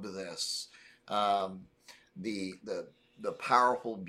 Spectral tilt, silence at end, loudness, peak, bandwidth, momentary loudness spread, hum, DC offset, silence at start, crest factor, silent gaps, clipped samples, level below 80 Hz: -3 dB/octave; 0 s; -33 LUFS; -10 dBFS; 15 kHz; 19 LU; none; under 0.1%; 0 s; 24 dB; none; under 0.1%; -76 dBFS